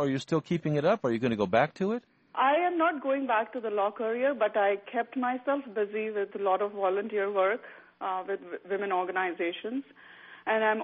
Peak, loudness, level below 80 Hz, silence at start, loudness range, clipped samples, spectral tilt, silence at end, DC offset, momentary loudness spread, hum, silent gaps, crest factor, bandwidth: -10 dBFS; -29 LUFS; -72 dBFS; 0 s; 4 LU; under 0.1%; -4.5 dB/octave; 0 s; under 0.1%; 9 LU; none; none; 18 dB; 8 kHz